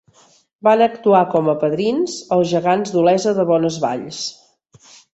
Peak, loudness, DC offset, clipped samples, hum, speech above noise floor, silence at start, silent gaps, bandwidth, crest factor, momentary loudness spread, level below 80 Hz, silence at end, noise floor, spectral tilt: -2 dBFS; -17 LUFS; under 0.1%; under 0.1%; none; 37 dB; 0.65 s; none; 8.2 kHz; 16 dB; 8 LU; -62 dBFS; 0.8 s; -54 dBFS; -5.5 dB/octave